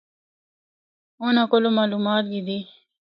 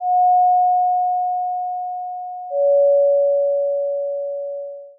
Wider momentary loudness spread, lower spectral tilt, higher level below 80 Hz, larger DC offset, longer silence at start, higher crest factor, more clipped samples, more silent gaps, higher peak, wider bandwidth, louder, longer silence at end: about the same, 11 LU vs 13 LU; first, -8.5 dB/octave vs 24.5 dB/octave; first, -74 dBFS vs under -90 dBFS; neither; first, 1.2 s vs 0 s; first, 18 dB vs 8 dB; neither; neither; first, -6 dBFS vs -10 dBFS; first, 5.4 kHz vs 0.8 kHz; second, -22 LUFS vs -18 LUFS; first, 0.5 s vs 0.1 s